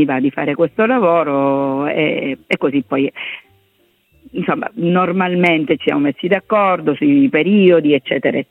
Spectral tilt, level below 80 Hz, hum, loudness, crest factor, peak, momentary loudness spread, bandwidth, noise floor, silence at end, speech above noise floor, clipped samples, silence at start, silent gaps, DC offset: -8.5 dB/octave; -60 dBFS; none; -15 LUFS; 14 dB; 0 dBFS; 8 LU; 4.1 kHz; -58 dBFS; 0.1 s; 44 dB; under 0.1%; 0 s; none; under 0.1%